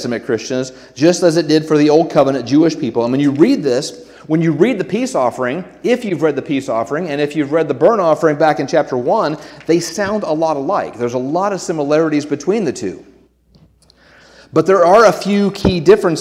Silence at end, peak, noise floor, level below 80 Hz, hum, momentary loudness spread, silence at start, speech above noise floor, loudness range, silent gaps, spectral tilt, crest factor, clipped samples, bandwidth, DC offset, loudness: 0 s; 0 dBFS; -50 dBFS; -46 dBFS; none; 8 LU; 0 s; 36 dB; 5 LU; none; -6 dB/octave; 14 dB; under 0.1%; 14.5 kHz; under 0.1%; -15 LUFS